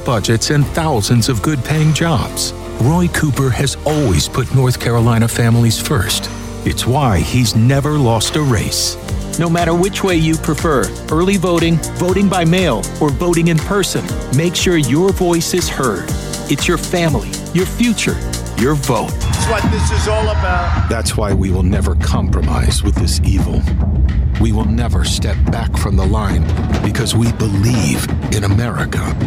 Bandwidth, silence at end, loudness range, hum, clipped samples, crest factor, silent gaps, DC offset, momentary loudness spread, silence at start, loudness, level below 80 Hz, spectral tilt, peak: 16.5 kHz; 0 s; 2 LU; none; under 0.1%; 10 dB; none; under 0.1%; 5 LU; 0 s; -15 LUFS; -22 dBFS; -5 dB/octave; -4 dBFS